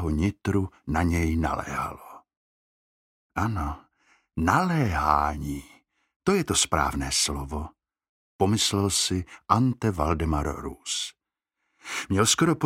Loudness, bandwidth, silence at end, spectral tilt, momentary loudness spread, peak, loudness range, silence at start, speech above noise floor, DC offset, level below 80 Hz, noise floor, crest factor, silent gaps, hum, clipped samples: -26 LUFS; 16.5 kHz; 0 s; -4 dB/octave; 13 LU; -4 dBFS; 5 LU; 0 s; 57 dB; under 0.1%; -40 dBFS; -82 dBFS; 22 dB; 2.37-3.30 s, 6.16-6.20 s, 8.09-8.39 s; none; under 0.1%